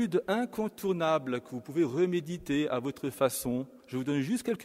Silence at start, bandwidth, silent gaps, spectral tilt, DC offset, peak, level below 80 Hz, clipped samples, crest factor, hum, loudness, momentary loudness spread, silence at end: 0 s; 16 kHz; none; -5.5 dB/octave; under 0.1%; -14 dBFS; -64 dBFS; under 0.1%; 16 dB; none; -31 LUFS; 8 LU; 0 s